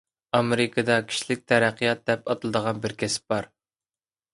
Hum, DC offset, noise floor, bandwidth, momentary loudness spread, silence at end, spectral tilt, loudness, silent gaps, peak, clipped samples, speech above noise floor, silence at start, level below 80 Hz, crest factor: none; under 0.1%; under -90 dBFS; 11.5 kHz; 7 LU; 0.9 s; -4.5 dB/octave; -25 LUFS; none; -4 dBFS; under 0.1%; over 65 dB; 0.35 s; -62 dBFS; 22 dB